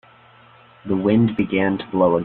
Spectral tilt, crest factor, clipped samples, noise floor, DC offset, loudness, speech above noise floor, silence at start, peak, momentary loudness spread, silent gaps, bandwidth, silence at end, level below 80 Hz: -11 dB/octave; 18 dB; under 0.1%; -49 dBFS; under 0.1%; -19 LUFS; 31 dB; 0.85 s; -4 dBFS; 7 LU; none; 4.3 kHz; 0 s; -52 dBFS